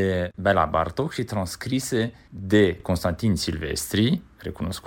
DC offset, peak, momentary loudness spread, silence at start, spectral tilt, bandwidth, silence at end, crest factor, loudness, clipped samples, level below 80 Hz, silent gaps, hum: under 0.1%; -6 dBFS; 10 LU; 0 s; -5.5 dB/octave; 17 kHz; 0 s; 18 dB; -24 LUFS; under 0.1%; -44 dBFS; none; none